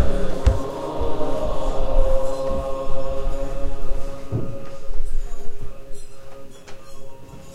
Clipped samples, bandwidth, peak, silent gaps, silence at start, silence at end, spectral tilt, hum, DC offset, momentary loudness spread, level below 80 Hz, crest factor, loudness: under 0.1%; 7.8 kHz; -4 dBFS; none; 0 s; 0 s; -7 dB/octave; none; under 0.1%; 20 LU; -24 dBFS; 14 dB; -27 LUFS